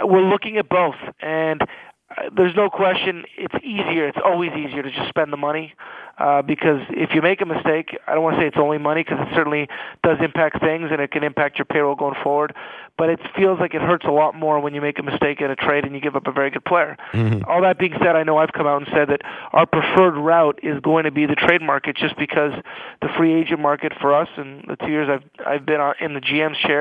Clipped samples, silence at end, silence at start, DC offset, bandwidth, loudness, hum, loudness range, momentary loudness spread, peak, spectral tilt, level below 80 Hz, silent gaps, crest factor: under 0.1%; 0 s; 0 s; under 0.1%; 5 kHz; -19 LUFS; none; 4 LU; 9 LU; 0 dBFS; -8 dB/octave; -56 dBFS; none; 20 dB